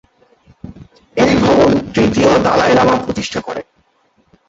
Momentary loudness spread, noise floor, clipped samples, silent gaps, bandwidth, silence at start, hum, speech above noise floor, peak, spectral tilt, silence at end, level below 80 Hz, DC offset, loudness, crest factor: 13 LU; -58 dBFS; under 0.1%; none; 8 kHz; 0.65 s; none; 45 dB; -2 dBFS; -5.5 dB/octave; 0.85 s; -38 dBFS; under 0.1%; -13 LUFS; 14 dB